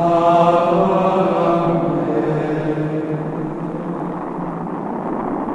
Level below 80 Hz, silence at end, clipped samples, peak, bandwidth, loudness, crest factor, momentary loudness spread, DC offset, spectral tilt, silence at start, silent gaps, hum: -46 dBFS; 0 s; under 0.1%; 0 dBFS; 10 kHz; -18 LUFS; 18 dB; 11 LU; under 0.1%; -8.5 dB/octave; 0 s; none; none